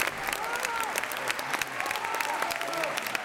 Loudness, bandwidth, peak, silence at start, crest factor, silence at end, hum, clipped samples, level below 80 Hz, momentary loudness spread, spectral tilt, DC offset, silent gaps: -30 LUFS; 17 kHz; -10 dBFS; 0 s; 22 dB; 0 s; none; under 0.1%; -64 dBFS; 2 LU; -1 dB/octave; under 0.1%; none